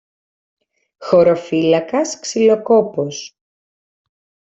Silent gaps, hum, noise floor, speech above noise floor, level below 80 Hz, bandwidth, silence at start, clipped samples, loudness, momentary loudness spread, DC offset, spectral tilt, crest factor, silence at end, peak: none; none; under -90 dBFS; over 75 dB; -62 dBFS; 8.2 kHz; 1 s; under 0.1%; -16 LUFS; 15 LU; under 0.1%; -5 dB/octave; 16 dB; 1.25 s; -2 dBFS